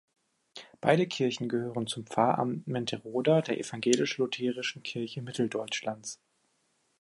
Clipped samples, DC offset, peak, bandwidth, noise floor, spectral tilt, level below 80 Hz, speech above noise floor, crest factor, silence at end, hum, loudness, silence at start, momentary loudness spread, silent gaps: under 0.1%; under 0.1%; -8 dBFS; 11.5 kHz; -74 dBFS; -5 dB/octave; -74 dBFS; 44 dB; 22 dB; 0.85 s; none; -30 LUFS; 0.55 s; 11 LU; none